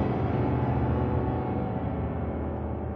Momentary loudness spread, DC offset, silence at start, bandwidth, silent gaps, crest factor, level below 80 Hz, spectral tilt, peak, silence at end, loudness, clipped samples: 5 LU; under 0.1%; 0 s; 5 kHz; none; 12 dB; -38 dBFS; -11.5 dB/octave; -16 dBFS; 0 s; -29 LUFS; under 0.1%